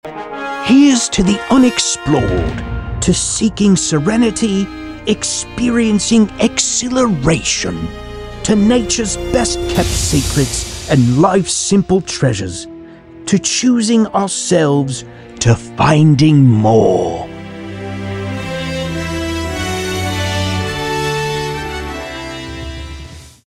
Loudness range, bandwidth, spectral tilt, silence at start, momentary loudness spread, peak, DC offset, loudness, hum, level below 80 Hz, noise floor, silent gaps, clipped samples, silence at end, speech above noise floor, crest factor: 7 LU; 14.5 kHz; -4.5 dB/octave; 0.05 s; 15 LU; -2 dBFS; under 0.1%; -14 LUFS; none; -32 dBFS; -35 dBFS; none; under 0.1%; 0.2 s; 22 dB; 14 dB